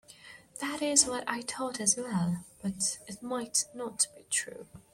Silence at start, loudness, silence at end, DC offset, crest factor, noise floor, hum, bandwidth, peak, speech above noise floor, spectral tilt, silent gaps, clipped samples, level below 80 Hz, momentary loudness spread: 0.1 s; -30 LUFS; 0.15 s; under 0.1%; 26 dB; -53 dBFS; none; 16.5 kHz; -6 dBFS; 21 dB; -2.5 dB/octave; none; under 0.1%; -68 dBFS; 17 LU